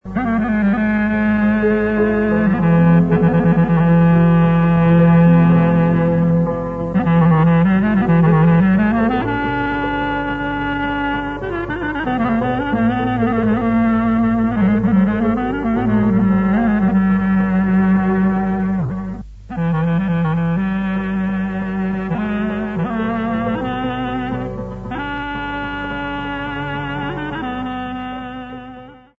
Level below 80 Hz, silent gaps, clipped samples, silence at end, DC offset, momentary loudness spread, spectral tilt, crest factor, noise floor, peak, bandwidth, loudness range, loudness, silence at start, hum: -36 dBFS; none; under 0.1%; 0.25 s; under 0.1%; 11 LU; -10 dB/octave; 14 dB; -37 dBFS; -2 dBFS; 4 kHz; 10 LU; -17 LUFS; 0.05 s; none